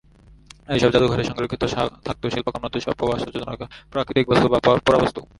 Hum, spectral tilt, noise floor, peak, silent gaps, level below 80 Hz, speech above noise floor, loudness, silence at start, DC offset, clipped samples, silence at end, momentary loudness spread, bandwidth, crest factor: none; -6 dB/octave; -48 dBFS; -2 dBFS; none; -42 dBFS; 27 dB; -21 LUFS; 0.7 s; under 0.1%; under 0.1%; 0.15 s; 12 LU; 11.5 kHz; 20 dB